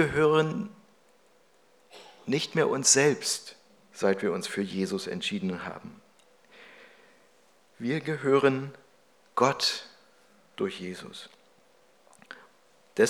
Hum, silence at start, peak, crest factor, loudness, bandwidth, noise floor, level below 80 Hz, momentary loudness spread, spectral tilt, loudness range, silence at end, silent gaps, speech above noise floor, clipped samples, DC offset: none; 0 s; -8 dBFS; 22 dB; -27 LUFS; 18.5 kHz; -63 dBFS; -68 dBFS; 24 LU; -3.5 dB/octave; 9 LU; 0 s; none; 36 dB; under 0.1%; under 0.1%